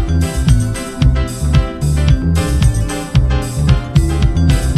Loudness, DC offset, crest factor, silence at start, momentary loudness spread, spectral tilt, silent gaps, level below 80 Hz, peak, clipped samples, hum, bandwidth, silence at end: -15 LUFS; under 0.1%; 12 dB; 0 s; 3 LU; -6 dB/octave; none; -16 dBFS; 0 dBFS; under 0.1%; none; 14 kHz; 0 s